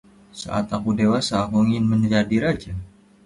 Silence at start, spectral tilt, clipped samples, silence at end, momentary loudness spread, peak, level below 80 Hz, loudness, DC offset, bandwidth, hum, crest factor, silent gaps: 0.35 s; -6 dB/octave; under 0.1%; 0.4 s; 12 LU; -8 dBFS; -46 dBFS; -21 LUFS; under 0.1%; 11.5 kHz; none; 14 dB; none